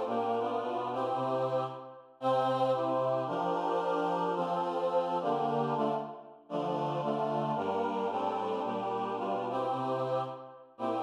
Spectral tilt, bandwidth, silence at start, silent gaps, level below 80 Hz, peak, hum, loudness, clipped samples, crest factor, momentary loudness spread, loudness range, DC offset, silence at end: -7 dB/octave; 10 kHz; 0 s; none; -90 dBFS; -18 dBFS; none; -32 LUFS; under 0.1%; 14 dB; 7 LU; 2 LU; under 0.1%; 0 s